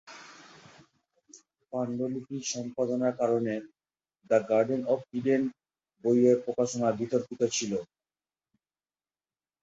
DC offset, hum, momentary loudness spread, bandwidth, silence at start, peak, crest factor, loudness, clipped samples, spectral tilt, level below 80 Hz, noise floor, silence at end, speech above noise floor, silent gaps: under 0.1%; none; 11 LU; 8.2 kHz; 0.05 s; -10 dBFS; 20 dB; -29 LUFS; under 0.1%; -5 dB/octave; -74 dBFS; under -90 dBFS; 1.8 s; over 62 dB; none